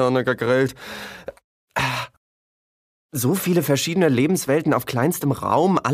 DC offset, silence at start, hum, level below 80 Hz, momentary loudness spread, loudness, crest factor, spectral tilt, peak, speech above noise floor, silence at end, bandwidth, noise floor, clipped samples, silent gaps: under 0.1%; 0 s; none; -56 dBFS; 15 LU; -21 LUFS; 18 dB; -5.5 dB/octave; -4 dBFS; over 70 dB; 0 s; 15.5 kHz; under -90 dBFS; under 0.1%; 1.44-1.68 s, 2.17-3.09 s